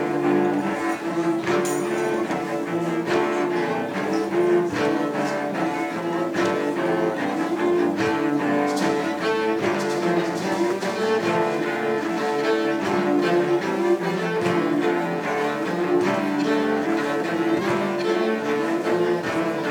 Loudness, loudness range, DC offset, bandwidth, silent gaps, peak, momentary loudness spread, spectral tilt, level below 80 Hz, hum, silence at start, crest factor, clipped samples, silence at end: -23 LUFS; 1 LU; under 0.1%; 18 kHz; none; -8 dBFS; 4 LU; -5.5 dB/octave; -66 dBFS; none; 0 s; 14 dB; under 0.1%; 0 s